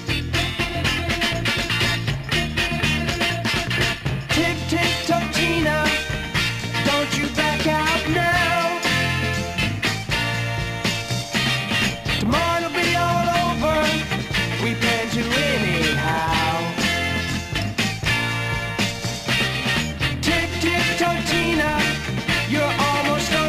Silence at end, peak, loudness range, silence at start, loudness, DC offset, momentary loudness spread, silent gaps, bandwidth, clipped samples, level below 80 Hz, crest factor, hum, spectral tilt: 0 s; -6 dBFS; 2 LU; 0 s; -20 LUFS; under 0.1%; 4 LU; none; 15.5 kHz; under 0.1%; -38 dBFS; 14 dB; none; -4 dB/octave